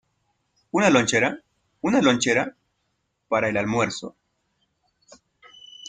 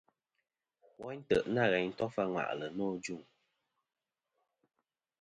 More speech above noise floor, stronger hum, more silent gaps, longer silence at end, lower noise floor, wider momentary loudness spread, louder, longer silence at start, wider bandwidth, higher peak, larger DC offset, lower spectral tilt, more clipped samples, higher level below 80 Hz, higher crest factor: about the same, 53 dB vs 50 dB; neither; neither; second, 0 s vs 2 s; second, -74 dBFS vs -84 dBFS; about the same, 14 LU vs 16 LU; first, -22 LUFS vs -34 LUFS; second, 0.75 s vs 1 s; about the same, 9.6 kHz vs 8.8 kHz; first, -4 dBFS vs -14 dBFS; neither; second, -4 dB/octave vs -5.5 dB/octave; neither; first, -62 dBFS vs -68 dBFS; about the same, 20 dB vs 24 dB